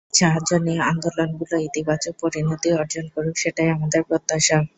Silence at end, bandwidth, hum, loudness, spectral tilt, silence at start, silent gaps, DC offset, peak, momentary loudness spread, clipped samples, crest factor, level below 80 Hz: 0.1 s; 8.4 kHz; none; -21 LUFS; -4 dB/octave; 0.15 s; none; under 0.1%; -4 dBFS; 7 LU; under 0.1%; 18 dB; -54 dBFS